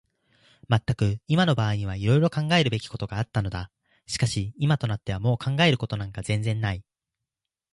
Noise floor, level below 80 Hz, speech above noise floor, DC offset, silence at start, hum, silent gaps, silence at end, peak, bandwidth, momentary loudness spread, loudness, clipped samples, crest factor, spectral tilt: -87 dBFS; -48 dBFS; 62 dB; under 0.1%; 0.7 s; none; none; 0.95 s; -8 dBFS; 11.5 kHz; 10 LU; -25 LUFS; under 0.1%; 18 dB; -6 dB/octave